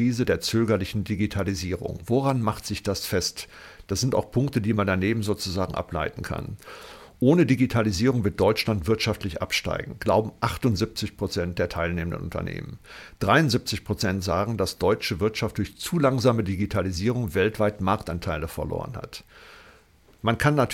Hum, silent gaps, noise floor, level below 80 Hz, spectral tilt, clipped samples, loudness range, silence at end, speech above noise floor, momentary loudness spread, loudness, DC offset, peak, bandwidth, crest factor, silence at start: none; none; -56 dBFS; -48 dBFS; -5.5 dB/octave; under 0.1%; 4 LU; 0 s; 31 dB; 11 LU; -25 LUFS; under 0.1%; -6 dBFS; 17 kHz; 20 dB; 0 s